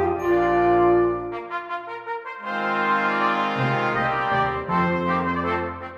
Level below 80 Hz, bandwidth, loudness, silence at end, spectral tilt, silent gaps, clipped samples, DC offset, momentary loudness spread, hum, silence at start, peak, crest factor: -48 dBFS; 7 kHz; -22 LUFS; 0 s; -7.5 dB/octave; none; under 0.1%; under 0.1%; 12 LU; none; 0 s; -8 dBFS; 14 dB